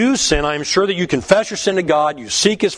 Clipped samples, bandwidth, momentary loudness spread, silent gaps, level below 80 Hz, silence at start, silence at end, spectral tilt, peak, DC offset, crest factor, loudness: under 0.1%; 10.5 kHz; 3 LU; none; -36 dBFS; 0 s; 0 s; -3.5 dB/octave; 0 dBFS; under 0.1%; 16 dB; -16 LUFS